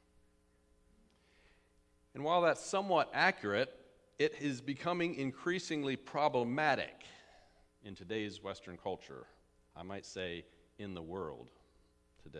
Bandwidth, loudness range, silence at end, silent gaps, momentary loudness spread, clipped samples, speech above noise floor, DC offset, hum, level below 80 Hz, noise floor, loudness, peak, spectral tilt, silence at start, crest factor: 11 kHz; 12 LU; 0 s; none; 21 LU; under 0.1%; 34 dB; under 0.1%; none; -72 dBFS; -71 dBFS; -36 LUFS; -14 dBFS; -4.5 dB/octave; 2.15 s; 24 dB